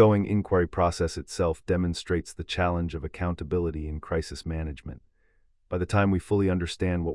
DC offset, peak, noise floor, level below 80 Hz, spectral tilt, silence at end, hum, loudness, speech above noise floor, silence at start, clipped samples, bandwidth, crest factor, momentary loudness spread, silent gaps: under 0.1%; -6 dBFS; -64 dBFS; -44 dBFS; -6.5 dB/octave; 0 s; none; -28 LUFS; 38 dB; 0 s; under 0.1%; 12 kHz; 20 dB; 9 LU; none